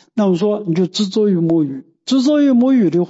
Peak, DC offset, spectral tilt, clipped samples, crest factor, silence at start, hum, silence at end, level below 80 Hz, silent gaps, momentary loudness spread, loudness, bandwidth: -6 dBFS; under 0.1%; -7 dB/octave; under 0.1%; 8 dB; 0.15 s; none; 0 s; -66 dBFS; none; 6 LU; -15 LUFS; 8 kHz